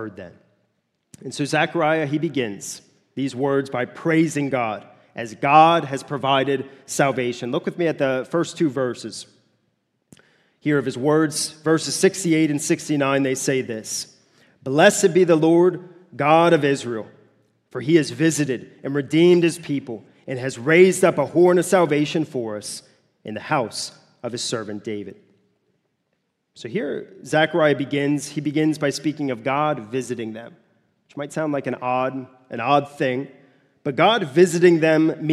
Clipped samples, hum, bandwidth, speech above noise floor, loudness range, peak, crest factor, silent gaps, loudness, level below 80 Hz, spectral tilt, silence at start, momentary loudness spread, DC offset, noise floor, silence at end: under 0.1%; none; 14 kHz; 53 dB; 8 LU; 0 dBFS; 20 dB; none; -20 LUFS; -70 dBFS; -5 dB/octave; 0 s; 18 LU; under 0.1%; -73 dBFS; 0 s